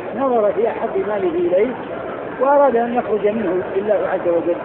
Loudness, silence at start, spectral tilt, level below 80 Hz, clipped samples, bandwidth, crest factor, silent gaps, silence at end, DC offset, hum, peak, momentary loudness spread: -18 LUFS; 0 s; -11 dB/octave; -54 dBFS; under 0.1%; 4 kHz; 14 dB; none; 0 s; under 0.1%; none; -4 dBFS; 7 LU